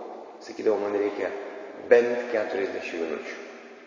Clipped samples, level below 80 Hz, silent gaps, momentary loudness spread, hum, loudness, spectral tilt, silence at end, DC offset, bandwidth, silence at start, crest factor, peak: under 0.1%; -74 dBFS; none; 19 LU; none; -26 LUFS; -4.5 dB/octave; 0 s; under 0.1%; 7.4 kHz; 0 s; 22 dB; -4 dBFS